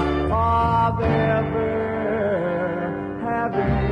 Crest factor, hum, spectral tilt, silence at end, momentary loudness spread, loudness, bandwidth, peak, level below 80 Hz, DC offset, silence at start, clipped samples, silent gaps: 14 dB; none; -9 dB/octave; 0 s; 6 LU; -22 LUFS; 10 kHz; -8 dBFS; -36 dBFS; under 0.1%; 0 s; under 0.1%; none